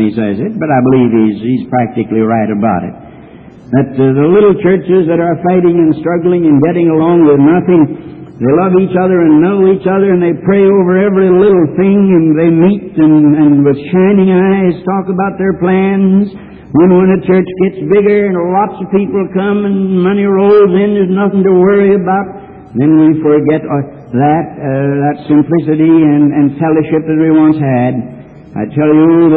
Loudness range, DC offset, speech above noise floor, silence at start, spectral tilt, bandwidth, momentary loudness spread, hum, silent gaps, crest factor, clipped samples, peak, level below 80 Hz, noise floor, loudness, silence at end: 3 LU; under 0.1%; 25 dB; 0 s; -12.5 dB/octave; 4.2 kHz; 7 LU; none; none; 8 dB; under 0.1%; 0 dBFS; -44 dBFS; -33 dBFS; -9 LUFS; 0 s